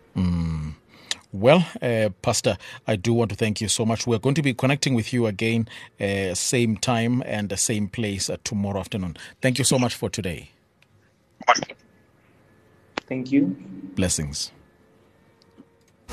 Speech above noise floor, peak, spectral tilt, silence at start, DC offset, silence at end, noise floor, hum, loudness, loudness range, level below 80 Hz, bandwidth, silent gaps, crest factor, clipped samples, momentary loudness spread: 37 dB; -2 dBFS; -4.5 dB/octave; 0.15 s; under 0.1%; 0 s; -60 dBFS; none; -24 LUFS; 5 LU; -48 dBFS; 13 kHz; none; 24 dB; under 0.1%; 11 LU